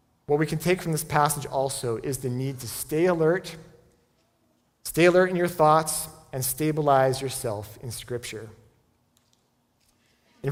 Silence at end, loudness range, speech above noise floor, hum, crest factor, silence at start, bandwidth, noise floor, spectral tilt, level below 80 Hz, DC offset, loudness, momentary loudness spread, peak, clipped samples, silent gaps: 0 s; 6 LU; 44 dB; none; 20 dB; 0.3 s; 18.5 kHz; -68 dBFS; -5 dB/octave; -56 dBFS; under 0.1%; -25 LUFS; 15 LU; -6 dBFS; under 0.1%; none